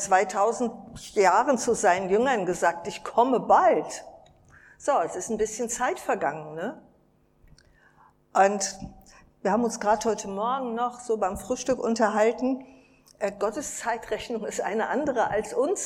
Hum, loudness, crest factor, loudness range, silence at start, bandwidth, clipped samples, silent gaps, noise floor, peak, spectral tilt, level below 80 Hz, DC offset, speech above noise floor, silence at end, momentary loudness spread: none; -26 LUFS; 20 dB; 6 LU; 0 s; 16 kHz; under 0.1%; none; -63 dBFS; -8 dBFS; -3.5 dB/octave; -58 dBFS; under 0.1%; 38 dB; 0 s; 11 LU